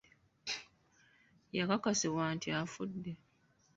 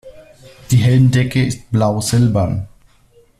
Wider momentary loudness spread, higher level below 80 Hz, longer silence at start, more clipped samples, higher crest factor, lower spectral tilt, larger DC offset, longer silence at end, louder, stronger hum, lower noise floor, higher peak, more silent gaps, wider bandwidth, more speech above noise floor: first, 14 LU vs 8 LU; second, -72 dBFS vs -42 dBFS; first, 0.45 s vs 0.05 s; neither; first, 22 dB vs 14 dB; second, -4 dB/octave vs -6.5 dB/octave; neither; second, 0.6 s vs 0.75 s; second, -37 LUFS vs -15 LUFS; neither; first, -69 dBFS vs -51 dBFS; second, -16 dBFS vs -2 dBFS; neither; second, 8 kHz vs 13.5 kHz; second, 33 dB vs 37 dB